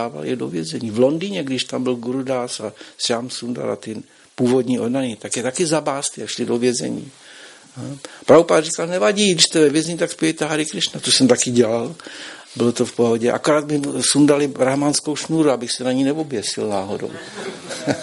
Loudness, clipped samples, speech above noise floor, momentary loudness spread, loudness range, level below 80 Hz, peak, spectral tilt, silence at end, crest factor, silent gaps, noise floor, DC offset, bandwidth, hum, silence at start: -19 LUFS; under 0.1%; 23 dB; 16 LU; 6 LU; -62 dBFS; 0 dBFS; -4 dB/octave; 0 s; 20 dB; none; -42 dBFS; under 0.1%; 11.5 kHz; none; 0 s